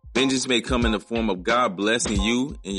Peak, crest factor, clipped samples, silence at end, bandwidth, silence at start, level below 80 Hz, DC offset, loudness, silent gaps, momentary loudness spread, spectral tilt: -6 dBFS; 16 dB; under 0.1%; 0 s; 11.5 kHz; 0.05 s; -36 dBFS; under 0.1%; -22 LUFS; none; 4 LU; -3.5 dB/octave